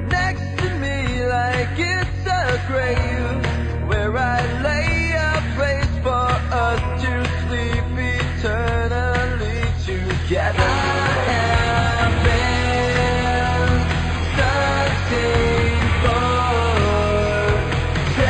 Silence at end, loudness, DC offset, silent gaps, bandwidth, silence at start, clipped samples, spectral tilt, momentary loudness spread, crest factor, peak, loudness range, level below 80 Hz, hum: 0 s; -19 LUFS; under 0.1%; none; 9 kHz; 0 s; under 0.1%; -5.5 dB/octave; 4 LU; 14 dB; -6 dBFS; 3 LU; -26 dBFS; none